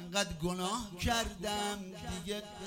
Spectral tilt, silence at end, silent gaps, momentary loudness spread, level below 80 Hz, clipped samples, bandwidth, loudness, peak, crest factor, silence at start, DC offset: -3.5 dB/octave; 0 s; none; 8 LU; -50 dBFS; under 0.1%; 16.5 kHz; -36 LUFS; -16 dBFS; 20 dB; 0 s; under 0.1%